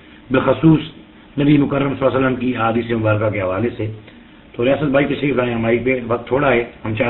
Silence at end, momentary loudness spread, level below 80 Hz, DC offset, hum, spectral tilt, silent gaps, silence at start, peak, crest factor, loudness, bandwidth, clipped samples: 0 s; 10 LU; -44 dBFS; under 0.1%; none; -11.5 dB/octave; none; 0.3 s; -2 dBFS; 16 dB; -17 LUFS; 4.2 kHz; under 0.1%